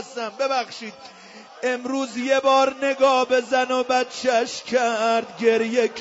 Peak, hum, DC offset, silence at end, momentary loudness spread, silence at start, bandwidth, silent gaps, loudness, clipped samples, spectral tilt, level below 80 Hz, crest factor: -6 dBFS; none; under 0.1%; 0 s; 10 LU; 0 s; 8 kHz; none; -21 LUFS; under 0.1%; -2.5 dB/octave; -70 dBFS; 16 dB